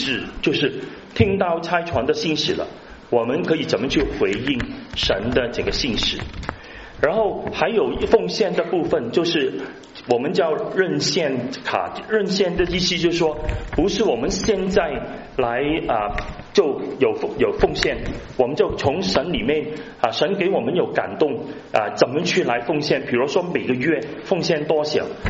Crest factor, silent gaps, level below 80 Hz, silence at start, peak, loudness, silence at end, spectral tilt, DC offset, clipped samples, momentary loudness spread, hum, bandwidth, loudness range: 20 dB; none; -38 dBFS; 0 s; -2 dBFS; -21 LUFS; 0 s; -3.5 dB/octave; under 0.1%; under 0.1%; 6 LU; none; 8 kHz; 1 LU